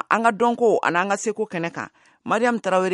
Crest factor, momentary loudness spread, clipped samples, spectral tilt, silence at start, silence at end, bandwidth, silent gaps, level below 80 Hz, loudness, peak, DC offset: 18 dB; 13 LU; under 0.1%; -4.5 dB/octave; 0.1 s; 0 s; 11.5 kHz; none; -70 dBFS; -21 LUFS; -2 dBFS; under 0.1%